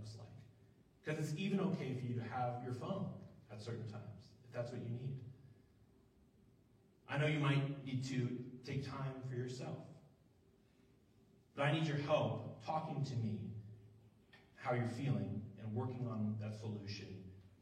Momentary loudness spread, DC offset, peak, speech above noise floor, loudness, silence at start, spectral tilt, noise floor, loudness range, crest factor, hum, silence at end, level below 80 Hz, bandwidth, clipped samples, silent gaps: 18 LU; under 0.1%; -22 dBFS; 30 dB; -42 LUFS; 0 s; -7 dB/octave; -70 dBFS; 8 LU; 20 dB; none; 0.1 s; -76 dBFS; 10.5 kHz; under 0.1%; none